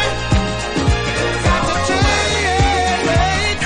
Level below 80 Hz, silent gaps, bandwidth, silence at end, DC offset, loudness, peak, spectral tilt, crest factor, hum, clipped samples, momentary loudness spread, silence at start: -24 dBFS; none; 10.5 kHz; 0 s; under 0.1%; -16 LUFS; -2 dBFS; -4 dB/octave; 14 dB; none; under 0.1%; 3 LU; 0 s